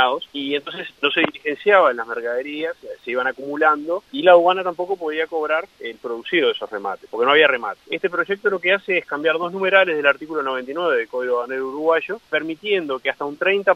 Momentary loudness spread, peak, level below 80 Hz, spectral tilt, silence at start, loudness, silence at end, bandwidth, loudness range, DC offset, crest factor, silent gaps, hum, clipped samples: 12 LU; 0 dBFS; -68 dBFS; -5 dB/octave; 0 s; -20 LUFS; 0 s; 8 kHz; 2 LU; under 0.1%; 20 dB; none; none; under 0.1%